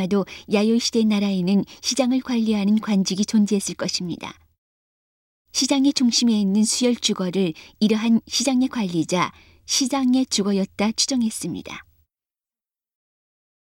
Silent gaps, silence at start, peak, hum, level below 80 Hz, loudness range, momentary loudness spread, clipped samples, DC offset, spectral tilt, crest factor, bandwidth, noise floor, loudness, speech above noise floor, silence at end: 4.58-5.45 s; 0 s; -6 dBFS; none; -60 dBFS; 4 LU; 8 LU; under 0.1%; under 0.1%; -4 dB/octave; 16 dB; 16.5 kHz; under -90 dBFS; -21 LUFS; over 69 dB; 1.8 s